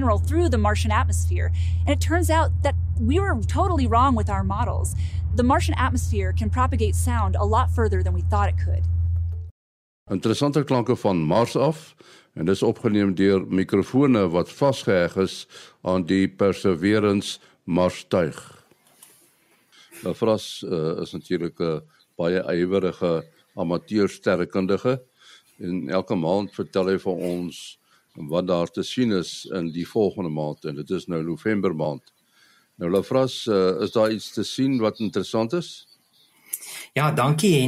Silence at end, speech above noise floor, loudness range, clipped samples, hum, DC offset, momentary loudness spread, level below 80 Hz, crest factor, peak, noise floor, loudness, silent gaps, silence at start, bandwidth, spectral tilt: 0 s; 38 dB; 5 LU; under 0.1%; none; under 0.1%; 10 LU; -34 dBFS; 16 dB; -6 dBFS; -60 dBFS; -23 LUFS; 9.51-10.06 s; 0 s; 14.5 kHz; -6.5 dB/octave